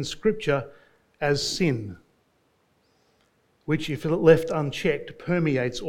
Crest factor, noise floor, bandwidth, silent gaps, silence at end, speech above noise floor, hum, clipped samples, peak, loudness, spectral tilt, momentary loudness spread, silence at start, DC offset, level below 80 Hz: 22 dB; -67 dBFS; 16 kHz; none; 0 s; 43 dB; none; under 0.1%; -4 dBFS; -24 LUFS; -5.5 dB/octave; 13 LU; 0 s; under 0.1%; -52 dBFS